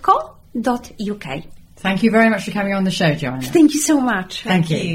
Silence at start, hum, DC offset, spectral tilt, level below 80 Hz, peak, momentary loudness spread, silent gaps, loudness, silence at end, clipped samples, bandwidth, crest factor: 0 s; none; under 0.1%; -5 dB/octave; -46 dBFS; -2 dBFS; 13 LU; none; -18 LUFS; 0 s; under 0.1%; 16 kHz; 14 dB